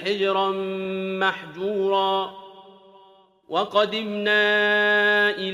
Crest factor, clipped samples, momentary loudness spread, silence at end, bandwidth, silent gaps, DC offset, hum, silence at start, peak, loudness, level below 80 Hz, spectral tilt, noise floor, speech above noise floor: 16 dB; under 0.1%; 10 LU; 0 s; 12.5 kHz; none; under 0.1%; none; 0 s; -6 dBFS; -22 LUFS; -72 dBFS; -5 dB/octave; -54 dBFS; 32 dB